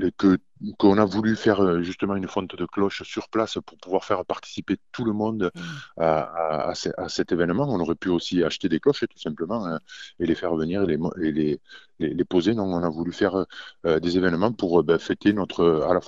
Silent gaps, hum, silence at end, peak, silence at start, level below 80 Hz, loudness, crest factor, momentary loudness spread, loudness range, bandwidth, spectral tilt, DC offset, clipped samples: none; none; 0 s; -4 dBFS; 0 s; -54 dBFS; -24 LUFS; 20 dB; 9 LU; 4 LU; 7.8 kHz; -6.5 dB/octave; 0.1%; under 0.1%